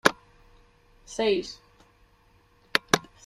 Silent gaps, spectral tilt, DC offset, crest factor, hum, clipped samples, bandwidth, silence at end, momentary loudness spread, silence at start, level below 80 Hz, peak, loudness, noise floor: none; -3 dB/octave; under 0.1%; 30 dB; none; under 0.1%; 15 kHz; 0.25 s; 20 LU; 0.05 s; -60 dBFS; -2 dBFS; -27 LUFS; -61 dBFS